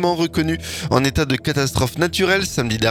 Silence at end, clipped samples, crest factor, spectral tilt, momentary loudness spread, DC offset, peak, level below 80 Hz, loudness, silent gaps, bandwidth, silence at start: 0 s; under 0.1%; 18 dB; -4.5 dB/octave; 4 LU; under 0.1%; -2 dBFS; -38 dBFS; -19 LUFS; none; 18.5 kHz; 0 s